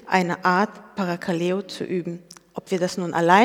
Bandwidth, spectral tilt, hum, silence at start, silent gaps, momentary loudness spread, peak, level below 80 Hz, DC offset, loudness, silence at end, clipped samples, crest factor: 15.5 kHz; -5.5 dB/octave; none; 0.05 s; none; 14 LU; 0 dBFS; -70 dBFS; under 0.1%; -24 LUFS; 0 s; under 0.1%; 22 dB